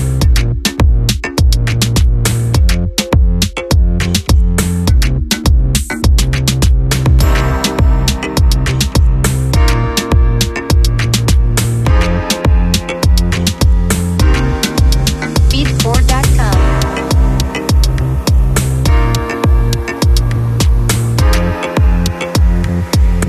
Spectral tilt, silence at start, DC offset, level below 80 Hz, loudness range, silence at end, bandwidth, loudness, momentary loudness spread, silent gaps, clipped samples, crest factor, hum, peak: -5 dB/octave; 0 s; under 0.1%; -12 dBFS; 1 LU; 0 s; 14 kHz; -13 LUFS; 2 LU; none; under 0.1%; 10 dB; none; 0 dBFS